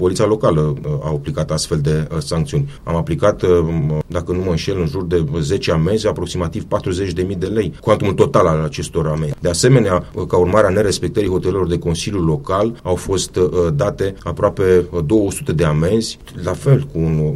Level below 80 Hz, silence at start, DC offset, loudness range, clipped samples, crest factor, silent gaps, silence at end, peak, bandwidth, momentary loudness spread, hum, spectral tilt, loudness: -34 dBFS; 0 s; under 0.1%; 3 LU; under 0.1%; 16 dB; none; 0 s; 0 dBFS; 13.5 kHz; 8 LU; none; -6 dB/octave; -17 LUFS